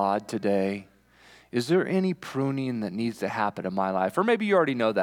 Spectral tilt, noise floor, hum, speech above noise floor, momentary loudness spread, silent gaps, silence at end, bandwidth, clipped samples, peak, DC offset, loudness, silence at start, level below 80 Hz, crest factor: -6.5 dB/octave; -56 dBFS; none; 30 dB; 8 LU; none; 0 s; 16.5 kHz; under 0.1%; -10 dBFS; under 0.1%; -26 LUFS; 0 s; -70 dBFS; 16 dB